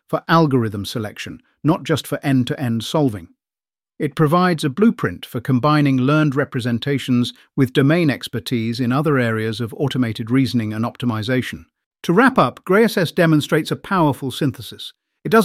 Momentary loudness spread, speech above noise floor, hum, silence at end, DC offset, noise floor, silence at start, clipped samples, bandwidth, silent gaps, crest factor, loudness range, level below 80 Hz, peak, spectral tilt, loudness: 11 LU; over 72 dB; none; 0 s; under 0.1%; under -90 dBFS; 0.1 s; under 0.1%; 16 kHz; 11.86-11.91 s; 16 dB; 3 LU; -56 dBFS; -2 dBFS; -6.5 dB/octave; -19 LUFS